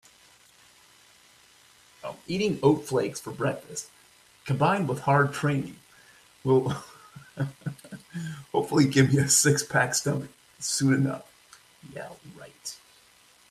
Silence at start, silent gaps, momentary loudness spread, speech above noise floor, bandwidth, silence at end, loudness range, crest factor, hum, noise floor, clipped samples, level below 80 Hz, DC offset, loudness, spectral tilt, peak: 2.05 s; none; 22 LU; 33 dB; 15 kHz; 0.75 s; 7 LU; 20 dB; none; -58 dBFS; under 0.1%; -64 dBFS; under 0.1%; -25 LUFS; -4.5 dB/octave; -8 dBFS